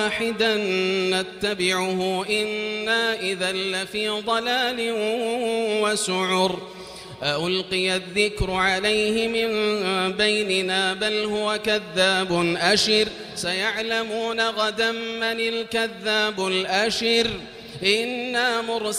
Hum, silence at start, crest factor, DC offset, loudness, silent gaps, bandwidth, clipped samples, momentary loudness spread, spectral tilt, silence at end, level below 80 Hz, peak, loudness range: none; 0 s; 20 dB; under 0.1%; -22 LUFS; none; 15.5 kHz; under 0.1%; 5 LU; -3 dB/octave; 0 s; -48 dBFS; -4 dBFS; 2 LU